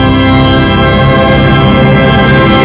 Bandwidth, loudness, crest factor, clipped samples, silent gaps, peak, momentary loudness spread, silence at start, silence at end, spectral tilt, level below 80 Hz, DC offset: 4 kHz; -6 LUFS; 6 dB; 0.3%; none; 0 dBFS; 1 LU; 0 s; 0 s; -10.5 dB/octave; -18 dBFS; under 0.1%